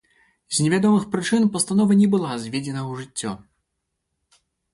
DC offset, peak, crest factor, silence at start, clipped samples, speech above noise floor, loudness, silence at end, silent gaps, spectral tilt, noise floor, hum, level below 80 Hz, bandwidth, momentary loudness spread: under 0.1%; -8 dBFS; 16 dB; 0.5 s; under 0.1%; 58 dB; -21 LUFS; 1.35 s; none; -5 dB/octave; -78 dBFS; none; -62 dBFS; 11.5 kHz; 13 LU